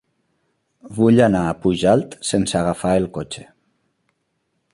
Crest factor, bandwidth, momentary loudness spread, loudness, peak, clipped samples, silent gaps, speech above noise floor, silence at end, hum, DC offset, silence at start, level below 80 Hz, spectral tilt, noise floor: 18 dB; 11.5 kHz; 16 LU; -18 LUFS; -2 dBFS; under 0.1%; none; 53 dB; 1.3 s; none; under 0.1%; 0.85 s; -46 dBFS; -6 dB/octave; -71 dBFS